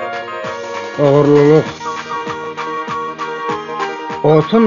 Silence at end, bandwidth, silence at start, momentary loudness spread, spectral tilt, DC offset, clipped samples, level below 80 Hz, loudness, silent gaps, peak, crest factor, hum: 0 s; 7.4 kHz; 0 s; 14 LU; -7 dB/octave; under 0.1%; under 0.1%; -52 dBFS; -16 LUFS; none; 0 dBFS; 14 dB; none